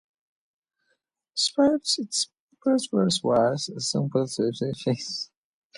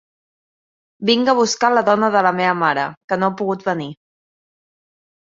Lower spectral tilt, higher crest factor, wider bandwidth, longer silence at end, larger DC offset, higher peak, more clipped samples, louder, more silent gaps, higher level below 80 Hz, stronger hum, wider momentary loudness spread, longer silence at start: about the same, -4.5 dB/octave vs -4 dB/octave; about the same, 18 dB vs 18 dB; first, 11.5 kHz vs 7.8 kHz; second, 0.5 s vs 1.3 s; neither; second, -10 dBFS vs -2 dBFS; neither; second, -25 LUFS vs -17 LUFS; about the same, 2.40-2.48 s vs 2.97-3.08 s; about the same, -64 dBFS vs -66 dBFS; neither; about the same, 10 LU vs 9 LU; first, 1.35 s vs 1 s